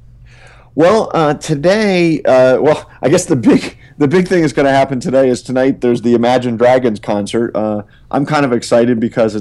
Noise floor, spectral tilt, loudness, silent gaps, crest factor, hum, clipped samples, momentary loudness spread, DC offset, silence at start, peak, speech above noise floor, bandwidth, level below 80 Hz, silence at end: -40 dBFS; -6 dB/octave; -13 LUFS; none; 12 dB; none; under 0.1%; 6 LU; under 0.1%; 0.75 s; 0 dBFS; 28 dB; 12.5 kHz; -44 dBFS; 0 s